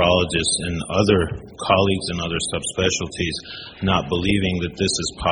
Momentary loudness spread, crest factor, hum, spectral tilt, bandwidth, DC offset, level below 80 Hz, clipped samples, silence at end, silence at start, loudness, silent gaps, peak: 8 LU; 20 dB; none; -4 dB/octave; 10.5 kHz; under 0.1%; -40 dBFS; under 0.1%; 0 s; 0 s; -21 LUFS; none; -2 dBFS